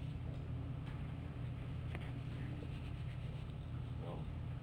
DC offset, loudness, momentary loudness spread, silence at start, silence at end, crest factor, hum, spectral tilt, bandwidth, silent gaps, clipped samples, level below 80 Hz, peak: under 0.1%; -46 LUFS; 1 LU; 0 s; 0 s; 14 dB; none; -8.5 dB/octave; 9.8 kHz; none; under 0.1%; -52 dBFS; -30 dBFS